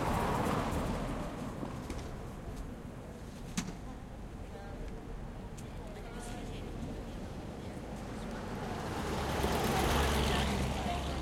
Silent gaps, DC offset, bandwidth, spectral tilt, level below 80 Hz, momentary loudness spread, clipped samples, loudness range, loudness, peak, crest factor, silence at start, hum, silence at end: none; under 0.1%; 16.5 kHz; -5 dB/octave; -44 dBFS; 15 LU; under 0.1%; 10 LU; -38 LUFS; -18 dBFS; 18 dB; 0 s; none; 0 s